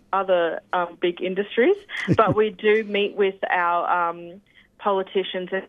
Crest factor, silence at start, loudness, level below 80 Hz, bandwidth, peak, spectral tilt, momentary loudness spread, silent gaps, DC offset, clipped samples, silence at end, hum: 18 dB; 0.1 s; -22 LUFS; -60 dBFS; 7.6 kHz; -4 dBFS; -7 dB/octave; 7 LU; none; under 0.1%; under 0.1%; 0 s; none